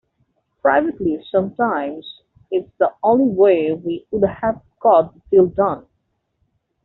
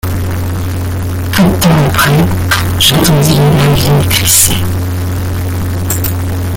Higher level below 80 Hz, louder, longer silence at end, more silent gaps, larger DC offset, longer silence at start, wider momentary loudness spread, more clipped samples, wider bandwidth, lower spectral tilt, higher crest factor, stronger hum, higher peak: second, -54 dBFS vs -26 dBFS; second, -18 LUFS vs -10 LUFS; first, 1.05 s vs 0 s; neither; neither; first, 0.65 s vs 0.05 s; about the same, 10 LU vs 10 LU; second, under 0.1% vs 0.2%; second, 4.1 kHz vs over 20 kHz; first, -5.5 dB/octave vs -4 dB/octave; first, 16 dB vs 10 dB; neither; about the same, -2 dBFS vs 0 dBFS